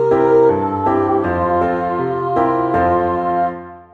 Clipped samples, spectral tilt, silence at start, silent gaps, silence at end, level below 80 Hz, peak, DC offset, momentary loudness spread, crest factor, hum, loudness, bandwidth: under 0.1%; -9.5 dB/octave; 0 s; none; 0.1 s; -44 dBFS; -2 dBFS; under 0.1%; 7 LU; 12 dB; none; -16 LUFS; 6.8 kHz